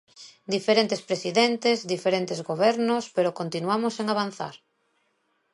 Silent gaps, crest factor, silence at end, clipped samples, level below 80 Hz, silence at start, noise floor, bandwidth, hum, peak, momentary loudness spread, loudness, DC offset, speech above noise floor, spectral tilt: none; 20 dB; 1 s; under 0.1%; -76 dBFS; 0.2 s; -72 dBFS; 11.5 kHz; none; -6 dBFS; 8 LU; -25 LUFS; under 0.1%; 47 dB; -4.5 dB/octave